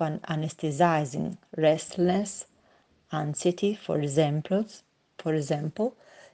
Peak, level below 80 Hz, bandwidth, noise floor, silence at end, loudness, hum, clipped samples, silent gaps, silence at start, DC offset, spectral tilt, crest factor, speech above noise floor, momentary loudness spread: -8 dBFS; -68 dBFS; 9.6 kHz; -64 dBFS; 0.45 s; -28 LUFS; none; under 0.1%; none; 0 s; under 0.1%; -6 dB/octave; 20 dB; 36 dB; 11 LU